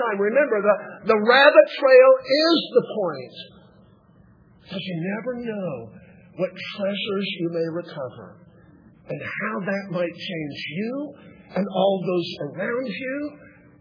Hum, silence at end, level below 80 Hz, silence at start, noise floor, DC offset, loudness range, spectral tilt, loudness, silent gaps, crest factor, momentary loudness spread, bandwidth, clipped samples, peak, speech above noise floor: none; 0.35 s; -68 dBFS; 0 s; -54 dBFS; under 0.1%; 14 LU; -6.5 dB/octave; -21 LUFS; none; 22 dB; 19 LU; 5.4 kHz; under 0.1%; 0 dBFS; 32 dB